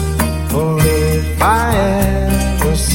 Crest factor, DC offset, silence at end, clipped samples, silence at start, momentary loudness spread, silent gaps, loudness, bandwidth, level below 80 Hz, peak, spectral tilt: 12 dB; under 0.1%; 0 s; under 0.1%; 0 s; 4 LU; none; -15 LUFS; 17 kHz; -20 dBFS; 0 dBFS; -5.5 dB/octave